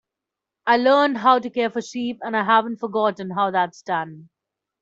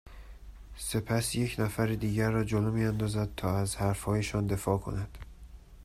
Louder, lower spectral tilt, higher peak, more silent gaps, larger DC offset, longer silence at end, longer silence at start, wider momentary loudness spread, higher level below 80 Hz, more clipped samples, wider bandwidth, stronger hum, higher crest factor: first, -21 LUFS vs -31 LUFS; about the same, -5 dB/octave vs -6 dB/octave; first, -4 dBFS vs -14 dBFS; neither; neither; first, 0.6 s vs 0 s; first, 0.65 s vs 0.05 s; about the same, 10 LU vs 11 LU; second, -72 dBFS vs -46 dBFS; neither; second, 7.8 kHz vs 15 kHz; neither; about the same, 18 dB vs 18 dB